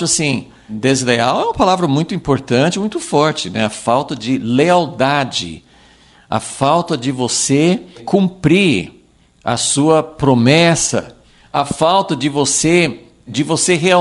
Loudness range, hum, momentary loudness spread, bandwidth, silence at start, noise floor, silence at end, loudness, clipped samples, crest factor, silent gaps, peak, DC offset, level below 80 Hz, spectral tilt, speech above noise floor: 3 LU; none; 9 LU; 11.5 kHz; 0 s; -47 dBFS; 0 s; -15 LUFS; under 0.1%; 14 dB; none; 0 dBFS; under 0.1%; -46 dBFS; -4 dB/octave; 32 dB